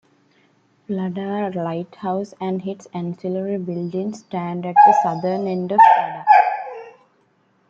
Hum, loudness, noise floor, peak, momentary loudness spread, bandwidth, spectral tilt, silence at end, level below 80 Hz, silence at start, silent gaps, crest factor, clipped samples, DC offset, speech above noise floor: none; -19 LUFS; -61 dBFS; -2 dBFS; 16 LU; 7.4 kHz; -7 dB/octave; 0.8 s; -70 dBFS; 0.9 s; none; 18 dB; under 0.1%; under 0.1%; 42 dB